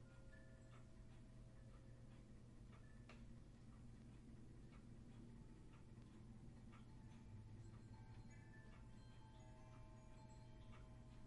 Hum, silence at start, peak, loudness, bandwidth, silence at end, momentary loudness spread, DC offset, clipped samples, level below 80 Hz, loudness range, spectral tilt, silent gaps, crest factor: none; 0 s; -50 dBFS; -64 LUFS; 11 kHz; 0 s; 3 LU; under 0.1%; under 0.1%; -66 dBFS; 2 LU; -6.5 dB/octave; none; 12 dB